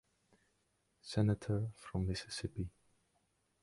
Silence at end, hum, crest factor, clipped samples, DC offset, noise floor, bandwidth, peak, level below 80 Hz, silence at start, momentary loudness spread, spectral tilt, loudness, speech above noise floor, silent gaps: 0.95 s; none; 20 dB; under 0.1%; under 0.1%; -79 dBFS; 11.5 kHz; -20 dBFS; -56 dBFS; 1.05 s; 11 LU; -6.5 dB/octave; -39 LUFS; 42 dB; none